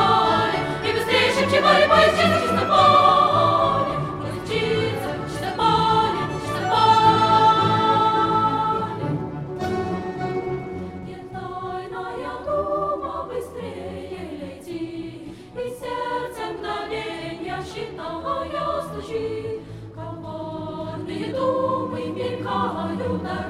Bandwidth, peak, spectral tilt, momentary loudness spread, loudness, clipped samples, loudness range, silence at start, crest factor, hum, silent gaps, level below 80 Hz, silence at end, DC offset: 15.5 kHz; -4 dBFS; -5.5 dB/octave; 17 LU; -21 LUFS; under 0.1%; 13 LU; 0 s; 18 dB; none; none; -48 dBFS; 0 s; under 0.1%